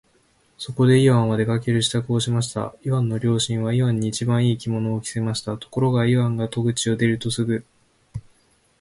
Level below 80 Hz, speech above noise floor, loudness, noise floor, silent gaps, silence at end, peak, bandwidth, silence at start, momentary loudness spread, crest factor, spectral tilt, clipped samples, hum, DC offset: -52 dBFS; 40 dB; -21 LUFS; -61 dBFS; none; 0.6 s; -6 dBFS; 11.5 kHz; 0.6 s; 11 LU; 16 dB; -6 dB/octave; under 0.1%; none; under 0.1%